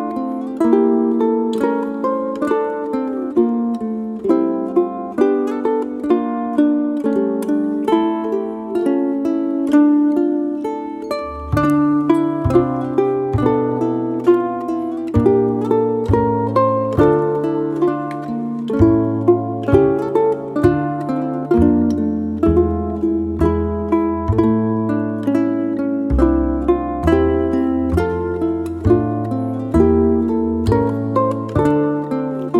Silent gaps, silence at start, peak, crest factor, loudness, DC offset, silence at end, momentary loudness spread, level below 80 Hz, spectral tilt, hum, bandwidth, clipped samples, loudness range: none; 0 s; -2 dBFS; 16 dB; -17 LUFS; under 0.1%; 0 s; 7 LU; -34 dBFS; -9 dB/octave; none; 11.5 kHz; under 0.1%; 2 LU